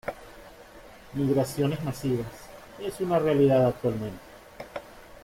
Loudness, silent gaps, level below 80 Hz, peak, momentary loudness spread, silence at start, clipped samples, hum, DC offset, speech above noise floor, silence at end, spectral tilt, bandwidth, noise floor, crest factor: -26 LUFS; none; -54 dBFS; -10 dBFS; 25 LU; 0.05 s; under 0.1%; none; under 0.1%; 23 dB; 0.05 s; -7 dB/octave; 16.5 kHz; -48 dBFS; 18 dB